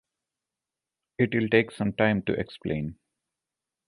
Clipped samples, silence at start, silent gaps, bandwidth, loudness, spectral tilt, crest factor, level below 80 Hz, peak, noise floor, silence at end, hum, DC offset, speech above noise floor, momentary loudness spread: under 0.1%; 1.2 s; none; 11.5 kHz; -26 LUFS; -7.5 dB/octave; 22 dB; -56 dBFS; -8 dBFS; -89 dBFS; 0.95 s; none; under 0.1%; 63 dB; 10 LU